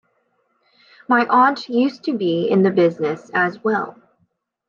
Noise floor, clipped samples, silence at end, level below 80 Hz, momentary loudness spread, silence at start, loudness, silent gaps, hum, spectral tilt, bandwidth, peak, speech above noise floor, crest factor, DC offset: -67 dBFS; under 0.1%; 0.8 s; -72 dBFS; 7 LU; 1.1 s; -18 LUFS; none; none; -7.5 dB/octave; 7.2 kHz; -4 dBFS; 49 dB; 16 dB; under 0.1%